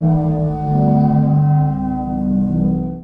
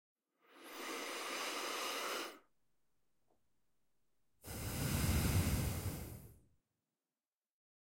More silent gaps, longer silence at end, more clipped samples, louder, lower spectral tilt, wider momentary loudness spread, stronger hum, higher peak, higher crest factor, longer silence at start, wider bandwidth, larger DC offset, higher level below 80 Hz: neither; second, 0 s vs 1.6 s; neither; first, -16 LUFS vs -40 LUFS; first, -12.5 dB/octave vs -4 dB/octave; second, 6 LU vs 17 LU; neither; first, -4 dBFS vs -24 dBFS; second, 10 dB vs 20 dB; second, 0 s vs 0.5 s; second, 2.2 kHz vs 16.5 kHz; neither; first, -34 dBFS vs -52 dBFS